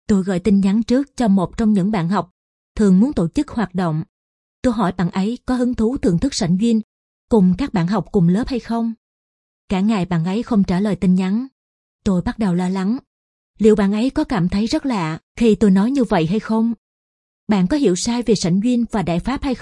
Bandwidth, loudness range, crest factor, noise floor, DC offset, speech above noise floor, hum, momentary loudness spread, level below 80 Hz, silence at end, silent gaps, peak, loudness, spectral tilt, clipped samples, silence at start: 11 kHz; 3 LU; 16 dB; under -90 dBFS; under 0.1%; over 73 dB; none; 7 LU; -40 dBFS; 0 s; 2.31-2.75 s, 4.09-4.63 s, 6.84-7.28 s, 8.97-9.68 s, 11.52-11.99 s, 13.07-13.54 s, 15.23-15.35 s, 16.78-17.47 s; -2 dBFS; -18 LUFS; -7 dB/octave; under 0.1%; 0.1 s